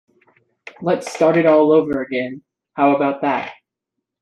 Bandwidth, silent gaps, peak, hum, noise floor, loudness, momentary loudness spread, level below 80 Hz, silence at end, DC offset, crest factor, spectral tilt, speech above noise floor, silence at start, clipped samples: 11.5 kHz; none; -2 dBFS; none; -80 dBFS; -17 LUFS; 16 LU; -62 dBFS; 0.7 s; under 0.1%; 16 dB; -6.5 dB/octave; 64 dB; 0.8 s; under 0.1%